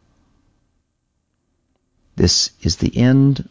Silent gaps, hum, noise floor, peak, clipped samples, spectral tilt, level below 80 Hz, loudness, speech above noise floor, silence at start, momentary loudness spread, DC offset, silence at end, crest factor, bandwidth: none; none; -70 dBFS; -2 dBFS; under 0.1%; -5 dB/octave; -34 dBFS; -16 LUFS; 55 dB; 2.15 s; 7 LU; under 0.1%; 0.1 s; 16 dB; 8 kHz